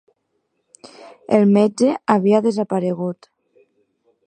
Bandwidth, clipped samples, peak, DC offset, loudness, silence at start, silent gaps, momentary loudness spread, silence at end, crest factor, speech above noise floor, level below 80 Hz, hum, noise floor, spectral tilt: 9.4 kHz; under 0.1%; 0 dBFS; under 0.1%; -17 LUFS; 1 s; none; 13 LU; 1.15 s; 20 dB; 53 dB; -68 dBFS; none; -71 dBFS; -7.5 dB/octave